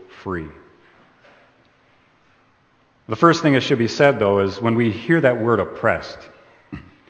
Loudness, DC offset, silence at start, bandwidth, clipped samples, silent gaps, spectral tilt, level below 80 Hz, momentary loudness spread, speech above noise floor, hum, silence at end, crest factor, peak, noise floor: -18 LUFS; under 0.1%; 0 s; 8.6 kHz; under 0.1%; none; -6.5 dB/octave; -54 dBFS; 23 LU; 41 dB; none; 0.3 s; 20 dB; 0 dBFS; -59 dBFS